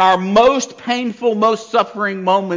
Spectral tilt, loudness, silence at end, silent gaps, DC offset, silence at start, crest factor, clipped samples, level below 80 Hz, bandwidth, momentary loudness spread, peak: -4.5 dB/octave; -16 LUFS; 0 s; none; under 0.1%; 0 s; 12 dB; under 0.1%; -54 dBFS; 7.6 kHz; 8 LU; -2 dBFS